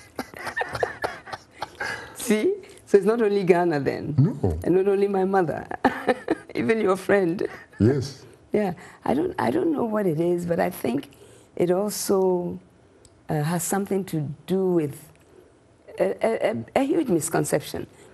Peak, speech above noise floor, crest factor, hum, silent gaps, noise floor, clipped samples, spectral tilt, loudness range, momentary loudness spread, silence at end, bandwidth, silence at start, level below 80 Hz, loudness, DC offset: -2 dBFS; 31 dB; 22 dB; none; none; -54 dBFS; under 0.1%; -6 dB/octave; 4 LU; 11 LU; 0.3 s; 12.5 kHz; 0.2 s; -52 dBFS; -24 LUFS; under 0.1%